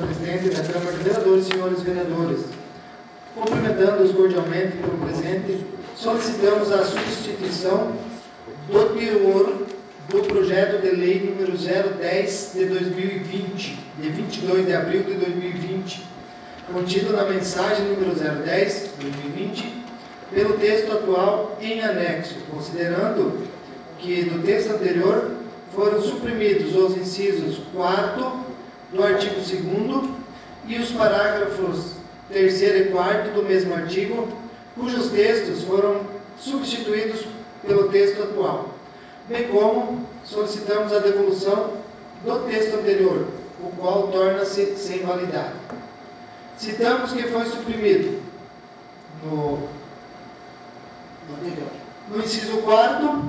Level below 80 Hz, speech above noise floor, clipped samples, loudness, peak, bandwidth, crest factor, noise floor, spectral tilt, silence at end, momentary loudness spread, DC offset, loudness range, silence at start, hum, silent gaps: -56 dBFS; 22 dB; under 0.1%; -22 LUFS; 0 dBFS; 8 kHz; 22 dB; -44 dBFS; -5.5 dB/octave; 0 s; 18 LU; under 0.1%; 4 LU; 0 s; none; none